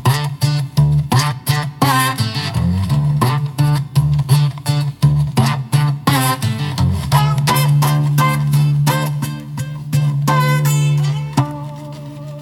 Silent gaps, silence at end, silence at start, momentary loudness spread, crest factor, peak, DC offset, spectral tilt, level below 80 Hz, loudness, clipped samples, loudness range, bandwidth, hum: none; 0 s; 0 s; 7 LU; 16 dB; 0 dBFS; under 0.1%; -5.5 dB/octave; -40 dBFS; -16 LUFS; under 0.1%; 1 LU; 17 kHz; none